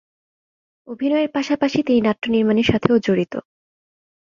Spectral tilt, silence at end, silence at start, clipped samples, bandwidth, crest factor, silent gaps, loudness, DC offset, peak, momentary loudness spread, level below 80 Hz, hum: -6.5 dB/octave; 0.9 s; 0.9 s; under 0.1%; 7.4 kHz; 18 dB; none; -19 LUFS; under 0.1%; -2 dBFS; 9 LU; -50 dBFS; none